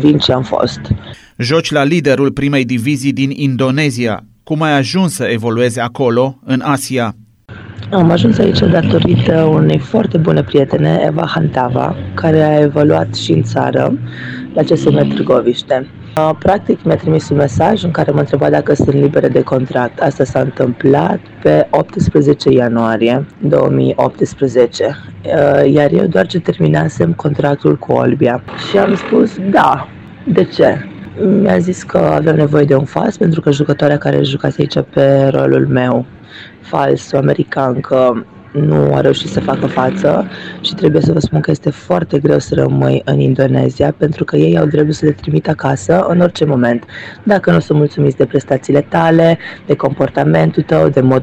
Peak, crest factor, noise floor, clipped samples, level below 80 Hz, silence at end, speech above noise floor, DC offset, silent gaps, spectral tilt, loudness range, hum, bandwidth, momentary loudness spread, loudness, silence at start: 0 dBFS; 12 dB; -33 dBFS; under 0.1%; -40 dBFS; 0 s; 21 dB; under 0.1%; none; -7 dB/octave; 2 LU; none; 12.5 kHz; 7 LU; -12 LUFS; 0 s